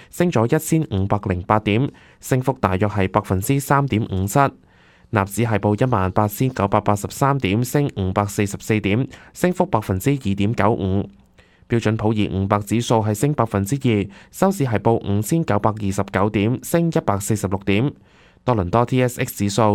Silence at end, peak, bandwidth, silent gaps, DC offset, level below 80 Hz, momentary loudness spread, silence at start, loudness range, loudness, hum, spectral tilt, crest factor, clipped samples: 0 s; 0 dBFS; 17.5 kHz; none; under 0.1%; -46 dBFS; 4 LU; 0 s; 1 LU; -20 LUFS; none; -6.5 dB/octave; 20 dB; under 0.1%